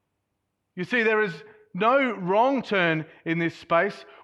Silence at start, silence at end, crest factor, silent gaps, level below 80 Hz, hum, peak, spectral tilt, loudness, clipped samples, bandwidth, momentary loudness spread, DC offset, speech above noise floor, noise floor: 0.75 s; 0.2 s; 18 dB; none; -72 dBFS; none; -8 dBFS; -6.5 dB/octave; -24 LUFS; under 0.1%; 11 kHz; 12 LU; under 0.1%; 54 dB; -78 dBFS